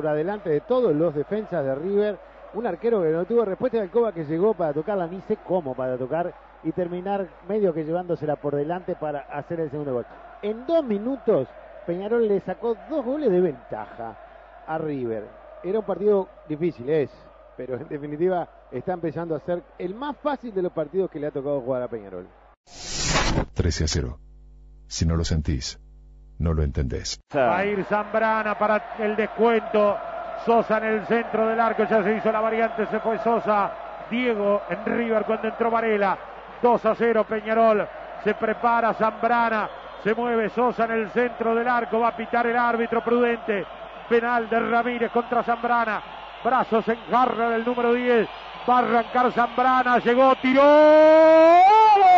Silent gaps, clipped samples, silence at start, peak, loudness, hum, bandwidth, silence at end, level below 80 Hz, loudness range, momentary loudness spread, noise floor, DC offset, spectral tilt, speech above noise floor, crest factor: 22.57-22.64 s; under 0.1%; 0 s; -8 dBFS; -23 LUFS; none; 8 kHz; 0 s; -42 dBFS; 6 LU; 12 LU; -47 dBFS; under 0.1%; -5.5 dB/octave; 25 dB; 14 dB